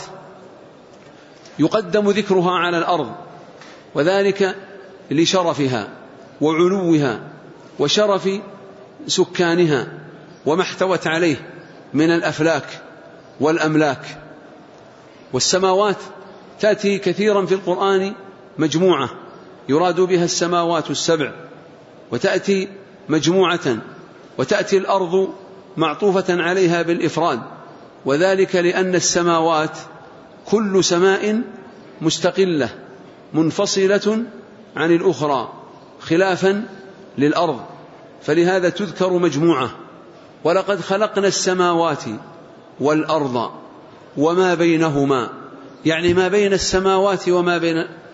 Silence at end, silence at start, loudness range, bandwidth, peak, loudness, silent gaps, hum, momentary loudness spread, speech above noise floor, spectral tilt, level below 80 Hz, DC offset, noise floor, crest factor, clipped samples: 0.05 s; 0 s; 2 LU; 8 kHz; -4 dBFS; -18 LUFS; none; none; 17 LU; 26 dB; -4.5 dB/octave; -54 dBFS; under 0.1%; -43 dBFS; 14 dB; under 0.1%